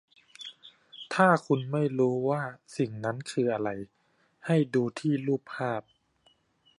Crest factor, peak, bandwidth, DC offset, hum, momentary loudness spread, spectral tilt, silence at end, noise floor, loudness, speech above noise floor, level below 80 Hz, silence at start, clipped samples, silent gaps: 22 dB; -8 dBFS; 11.5 kHz; under 0.1%; none; 20 LU; -7 dB/octave; 1 s; -67 dBFS; -29 LUFS; 40 dB; -74 dBFS; 0.4 s; under 0.1%; none